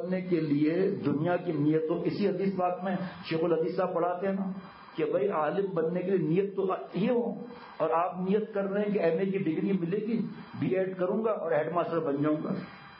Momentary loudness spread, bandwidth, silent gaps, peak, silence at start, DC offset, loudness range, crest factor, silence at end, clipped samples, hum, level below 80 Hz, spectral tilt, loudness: 6 LU; 5.8 kHz; none; -14 dBFS; 0 s; under 0.1%; 1 LU; 14 dB; 0 s; under 0.1%; none; -76 dBFS; -11.5 dB/octave; -30 LUFS